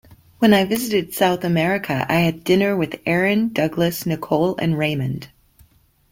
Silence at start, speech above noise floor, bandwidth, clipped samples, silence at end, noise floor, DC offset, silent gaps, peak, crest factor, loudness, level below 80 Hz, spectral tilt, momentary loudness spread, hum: 0.1 s; 36 dB; 16.5 kHz; under 0.1%; 0.85 s; -55 dBFS; under 0.1%; none; -2 dBFS; 18 dB; -19 LUFS; -52 dBFS; -6 dB/octave; 5 LU; none